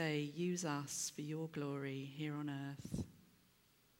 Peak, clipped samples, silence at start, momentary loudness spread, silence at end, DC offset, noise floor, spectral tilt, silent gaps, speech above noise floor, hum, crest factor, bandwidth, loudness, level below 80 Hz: -26 dBFS; under 0.1%; 0 s; 7 LU; 0.8 s; under 0.1%; -72 dBFS; -4.5 dB/octave; none; 29 dB; none; 18 dB; 17 kHz; -43 LUFS; -68 dBFS